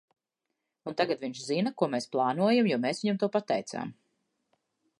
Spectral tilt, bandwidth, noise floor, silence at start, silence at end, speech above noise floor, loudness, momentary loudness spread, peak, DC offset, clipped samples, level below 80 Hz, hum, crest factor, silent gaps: -5.5 dB/octave; 11.5 kHz; -85 dBFS; 0.85 s; 1.1 s; 56 dB; -29 LUFS; 13 LU; -12 dBFS; under 0.1%; under 0.1%; -80 dBFS; none; 20 dB; none